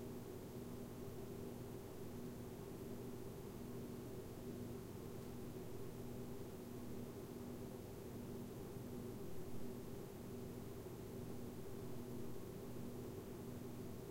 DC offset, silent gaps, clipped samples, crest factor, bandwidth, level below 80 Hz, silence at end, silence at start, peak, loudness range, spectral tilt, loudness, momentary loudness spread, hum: under 0.1%; none; under 0.1%; 14 dB; 16 kHz; -64 dBFS; 0 s; 0 s; -36 dBFS; 0 LU; -6.5 dB/octave; -52 LUFS; 1 LU; none